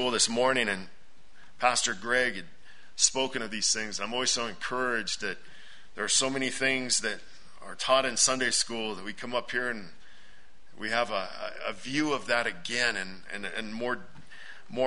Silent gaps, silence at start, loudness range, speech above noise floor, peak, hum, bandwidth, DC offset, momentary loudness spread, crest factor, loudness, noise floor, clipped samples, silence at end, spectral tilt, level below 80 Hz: none; 0 s; 5 LU; 29 dB; -8 dBFS; none; 11 kHz; 1%; 14 LU; 24 dB; -28 LUFS; -59 dBFS; under 0.1%; 0 s; -1 dB/octave; -62 dBFS